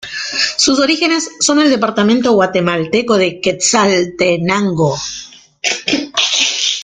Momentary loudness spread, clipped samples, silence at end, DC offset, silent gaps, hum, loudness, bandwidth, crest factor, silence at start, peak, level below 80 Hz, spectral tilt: 5 LU; under 0.1%; 0 s; under 0.1%; none; none; -13 LUFS; 10 kHz; 14 dB; 0 s; 0 dBFS; -52 dBFS; -3 dB/octave